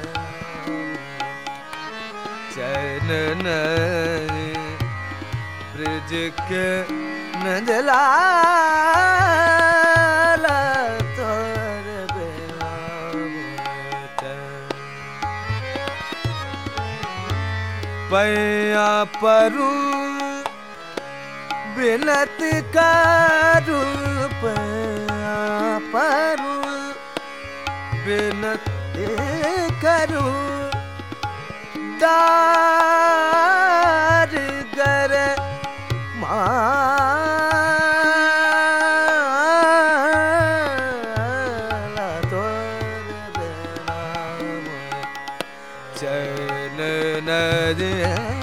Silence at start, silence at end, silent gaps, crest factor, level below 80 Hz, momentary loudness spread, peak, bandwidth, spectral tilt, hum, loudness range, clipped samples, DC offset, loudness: 0 s; 0 s; none; 18 dB; -48 dBFS; 15 LU; -2 dBFS; 16.5 kHz; -5 dB/octave; none; 12 LU; under 0.1%; 0.5%; -20 LUFS